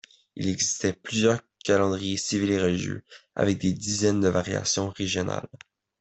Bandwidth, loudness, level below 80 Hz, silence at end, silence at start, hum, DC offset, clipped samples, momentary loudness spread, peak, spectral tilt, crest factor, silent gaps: 8.4 kHz; -26 LUFS; -60 dBFS; 0.45 s; 0.35 s; none; under 0.1%; under 0.1%; 10 LU; -8 dBFS; -4 dB/octave; 18 dB; none